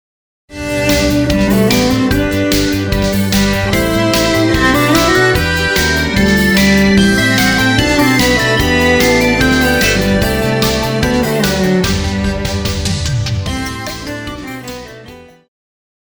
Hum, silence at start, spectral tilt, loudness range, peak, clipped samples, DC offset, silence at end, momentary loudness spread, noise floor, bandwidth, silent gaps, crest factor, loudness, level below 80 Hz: none; 0.5 s; -4.5 dB/octave; 7 LU; 0 dBFS; under 0.1%; 0.3%; 0.8 s; 10 LU; -36 dBFS; over 20 kHz; none; 12 dB; -12 LUFS; -26 dBFS